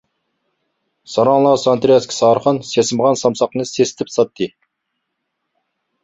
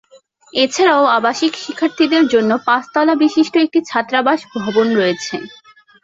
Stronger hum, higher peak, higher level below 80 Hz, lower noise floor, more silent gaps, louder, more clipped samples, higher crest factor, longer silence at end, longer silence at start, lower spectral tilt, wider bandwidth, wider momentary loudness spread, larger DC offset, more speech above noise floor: neither; about the same, -2 dBFS vs -2 dBFS; about the same, -58 dBFS vs -62 dBFS; first, -74 dBFS vs -46 dBFS; neither; about the same, -16 LUFS vs -15 LUFS; neither; about the same, 16 dB vs 14 dB; first, 1.55 s vs 0.55 s; first, 1.1 s vs 0.55 s; about the same, -5 dB/octave vs -4 dB/octave; about the same, 8 kHz vs 7.8 kHz; about the same, 7 LU vs 8 LU; neither; first, 60 dB vs 32 dB